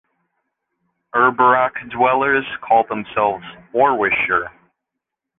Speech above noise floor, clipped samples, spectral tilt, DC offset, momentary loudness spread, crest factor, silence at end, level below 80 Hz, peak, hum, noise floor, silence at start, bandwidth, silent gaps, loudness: 64 dB; under 0.1%; -8 dB/octave; under 0.1%; 9 LU; 16 dB; 0.9 s; -56 dBFS; -2 dBFS; none; -81 dBFS; 1.15 s; 3.9 kHz; none; -17 LUFS